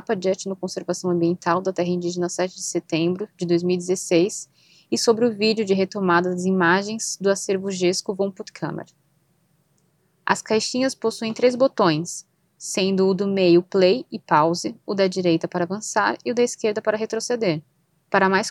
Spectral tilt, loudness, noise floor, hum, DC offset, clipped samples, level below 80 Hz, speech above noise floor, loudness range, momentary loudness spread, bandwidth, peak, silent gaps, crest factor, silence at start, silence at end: -4.5 dB/octave; -22 LUFS; -65 dBFS; none; under 0.1%; under 0.1%; -72 dBFS; 43 dB; 6 LU; 9 LU; 12.5 kHz; -2 dBFS; none; 20 dB; 0.1 s; 0 s